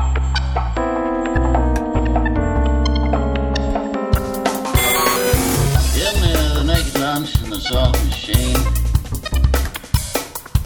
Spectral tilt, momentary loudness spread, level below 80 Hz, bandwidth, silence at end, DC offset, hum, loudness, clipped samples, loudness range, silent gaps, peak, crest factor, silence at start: -5 dB/octave; 5 LU; -20 dBFS; over 20 kHz; 0 s; under 0.1%; none; -18 LUFS; under 0.1%; 2 LU; none; -2 dBFS; 16 dB; 0 s